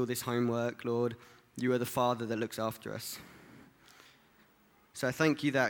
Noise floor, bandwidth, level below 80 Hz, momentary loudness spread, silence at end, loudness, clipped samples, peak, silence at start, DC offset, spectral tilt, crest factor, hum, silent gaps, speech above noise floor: -66 dBFS; 19 kHz; -72 dBFS; 17 LU; 0 s; -33 LUFS; under 0.1%; -14 dBFS; 0 s; under 0.1%; -5 dB/octave; 22 dB; none; none; 33 dB